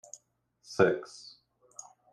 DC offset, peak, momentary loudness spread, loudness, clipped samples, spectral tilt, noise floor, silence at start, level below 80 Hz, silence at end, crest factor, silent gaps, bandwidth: under 0.1%; -10 dBFS; 24 LU; -29 LUFS; under 0.1%; -5 dB/octave; -70 dBFS; 0.7 s; -74 dBFS; 1.05 s; 24 dB; none; 11.5 kHz